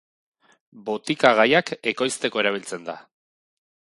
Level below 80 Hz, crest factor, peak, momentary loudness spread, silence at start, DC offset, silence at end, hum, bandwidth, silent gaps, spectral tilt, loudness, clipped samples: -70 dBFS; 24 dB; 0 dBFS; 18 LU; 0.75 s; under 0.1%; 0.9 s; none; 11.5 kHz; none; -3.5 dB/octave; -21 LUFS; under 0.1%